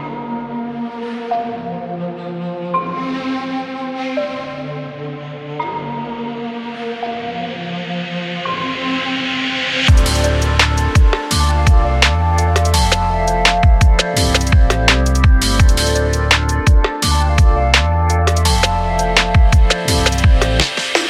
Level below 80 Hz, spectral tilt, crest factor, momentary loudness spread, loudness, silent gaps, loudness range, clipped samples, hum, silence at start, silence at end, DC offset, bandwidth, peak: -18 dBFS; -4.5 dB/octave; 14 dB; 13 LU; -16 LUFS; none; 11 LU; under 0.1%; none; 0 s; 0 s; under 0.1%; 14.5 kHz; 0 dBFS